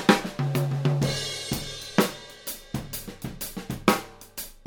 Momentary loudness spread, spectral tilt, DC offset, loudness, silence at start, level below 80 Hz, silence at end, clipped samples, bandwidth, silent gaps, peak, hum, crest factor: 12 LU; -5 dB/octave; under 0.1%; -28 LUFS; 0 s; -48 dBFS; 0.1 s; under 0.1%; over 20 kHz; none; -2 dBFS; none; 26 dB